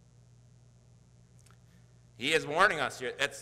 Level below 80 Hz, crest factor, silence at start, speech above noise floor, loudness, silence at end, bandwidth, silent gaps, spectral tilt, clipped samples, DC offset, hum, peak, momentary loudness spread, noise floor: -66 dBFS; 28 dB; 2.2 s; 30 dB; -29 LUFS; 0 s; 16 kHz; none; -2.5 dB/octave; under 0.1%; under 0.1%; 60 Hz at -60 dBFS; -6 dBFS; 9 LU; -60 dBFS